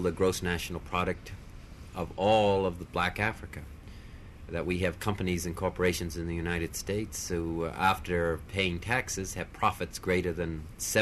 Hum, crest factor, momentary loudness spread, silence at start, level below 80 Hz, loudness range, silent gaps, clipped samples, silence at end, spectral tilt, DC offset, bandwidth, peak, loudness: none; 20 dB; 17 LU; 0 s; -46 dBFS; 2 LU; none; under 0.1%; 0 s; -4.5 dB/octave; under 0.1%; 13.5 kHz; -12 dBFS; -31 LUFS